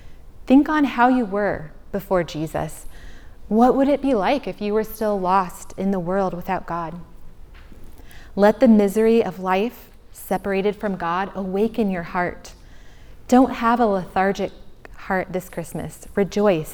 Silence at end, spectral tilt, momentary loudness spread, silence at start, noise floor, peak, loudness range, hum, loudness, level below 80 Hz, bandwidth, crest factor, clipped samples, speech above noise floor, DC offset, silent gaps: 0 s; -6.5 dB/octave; 15 LU; 0 s; -41 dBFS; -2 dBFS; 5 LU; none; -21 LUFS; -42 dBFS; over 20 kHz; 18 dB; under 0.1%; 21 dB; under 0.1%; none